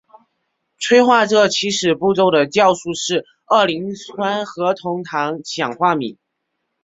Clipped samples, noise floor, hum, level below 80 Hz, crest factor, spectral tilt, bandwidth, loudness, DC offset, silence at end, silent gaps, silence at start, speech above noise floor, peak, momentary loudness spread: under 0.1%; -74 dBFS; none; -60 dBFS; 18 dB; -3.5 dB/octave; 8 kHz; -17 LUFS; under 0.1%; 0.7 s; none; 0.8 s; 58 dB; 0 dBFS; 10 LU